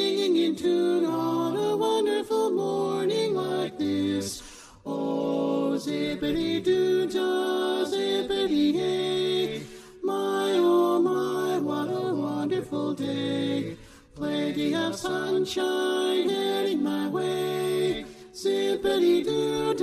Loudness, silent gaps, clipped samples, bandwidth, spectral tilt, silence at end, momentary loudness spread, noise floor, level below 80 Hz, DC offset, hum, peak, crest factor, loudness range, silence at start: -26 LUFS; none; under 0.1%; 14.5 kHz; -5 dB/octave; 0 s; 7 LU; -45 dBFS; -58 dBFS; under 0.1%; none; -12 dBFS; 14 dB; 3 LU; 0 s